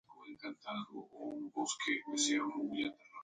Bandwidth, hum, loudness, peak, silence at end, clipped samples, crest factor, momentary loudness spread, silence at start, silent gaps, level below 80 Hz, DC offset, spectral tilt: 9.6 kHz; none; -38 LUFS; -22 dBFS; 0 s; under 0.1%; 18 dB; 15 LU; 0.1 s; none; -82 dBFS; under 0.1%; -1.5 dB/octave